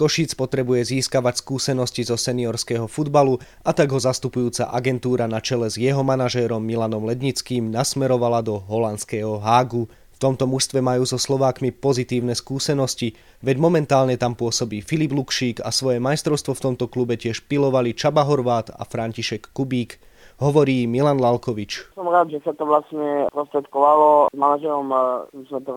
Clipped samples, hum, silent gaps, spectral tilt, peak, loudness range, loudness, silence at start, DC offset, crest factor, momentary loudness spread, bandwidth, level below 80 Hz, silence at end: under 0.1%; none; none; -5 dB/octave; -2 dBFS; 3 LU; -21 LUFS; 0 s; under 0.1%; 18 dB; 7 LU; 16 kHz; -54 dBFS; 0 s